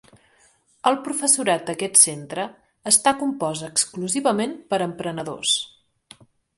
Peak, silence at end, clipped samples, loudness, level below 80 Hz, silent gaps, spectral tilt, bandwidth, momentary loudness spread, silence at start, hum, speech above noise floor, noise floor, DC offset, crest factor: 0 dBFS; 0.9 s; under 0.1%; -20 LUFS; -66 dBFS; none; -2 dB/octave; 12 kHz; 14 LU; 0.85 s; none; 38 dB; -60 dBFS; under 0.1%; 22 dB